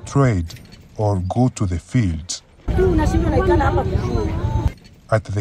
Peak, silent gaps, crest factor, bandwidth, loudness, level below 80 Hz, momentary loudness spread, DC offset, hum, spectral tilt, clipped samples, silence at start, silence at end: -4 dBFS; none; 16 dB; 11.5 kHz; -20 LUFS; -26 dBFS; 10 LU; under 0.1%; none; -7 dB/octave; under 0.1%; 0 s; 0 s